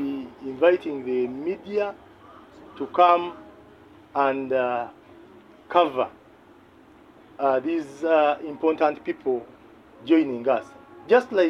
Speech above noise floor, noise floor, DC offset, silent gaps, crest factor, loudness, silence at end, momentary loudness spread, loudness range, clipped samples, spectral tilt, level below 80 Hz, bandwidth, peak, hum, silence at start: 29 dB; -52 dBFS; under 0.1%; none; 20 dB; -24 LUFS; 0 s; 11 LU; 3 LU; under 0.1%; -6 dB/octave; -66 dBFS; 8 kHz; -4 dBFS; none; 0 s